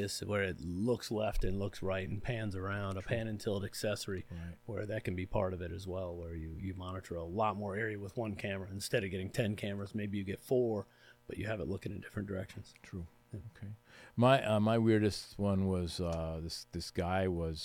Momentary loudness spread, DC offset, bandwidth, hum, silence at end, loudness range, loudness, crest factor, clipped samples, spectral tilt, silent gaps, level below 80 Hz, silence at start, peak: 16 LU; under 0.1%; 17.5 kHz; none; 0 s; 7 LU; -36 LUFS; 20 dB; under 0.1%; -6 dB/octave; none; -52 dBFS; 0 s; -16 dBFS